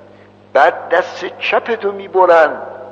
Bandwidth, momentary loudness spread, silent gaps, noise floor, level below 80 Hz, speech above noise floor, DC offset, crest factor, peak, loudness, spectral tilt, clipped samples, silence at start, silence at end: 7.8 kHz; 10 LU; none; -43 dBFS; -64 dBFS; 29 dB; under 0.1%; 14 dB; 0 dBFS; -14 LUFS; -4.5 dB/octave; under 0.1%; 0.55 s; 0 s